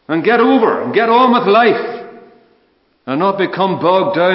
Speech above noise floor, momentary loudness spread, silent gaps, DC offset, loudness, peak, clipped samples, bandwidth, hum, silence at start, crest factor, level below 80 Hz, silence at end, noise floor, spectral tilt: 45 dB; 12 LU; none; under 0.1%; -13 LUFS; 0 dBFS; under 0.1%; 5.8 kHz; none; 0.1 s; 14 dB; -66 dBFS; 0 s; -57 dBFS; -10.5 dB/octave